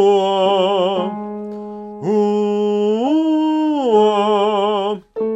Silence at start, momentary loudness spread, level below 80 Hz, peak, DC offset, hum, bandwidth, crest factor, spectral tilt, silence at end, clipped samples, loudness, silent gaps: 0 s; 13 LU; -60 dBFS; -2 dBFS; under 0.1%; none; 8.2 kHz; 14 dB; -6.5 dB/octave; 0 s; under 0.1%; -17 LUFS; none